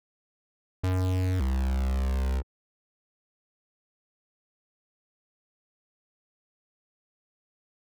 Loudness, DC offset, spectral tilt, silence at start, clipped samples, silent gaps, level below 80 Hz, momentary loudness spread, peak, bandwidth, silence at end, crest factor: -29 LUFS; under 0.1%; -7.5 dB/octave; 0.85 s; under 0.1%; none; -36 dBFS; 8 LU; -26 dBFS; 14 kHz; 5.55 s; 8 dB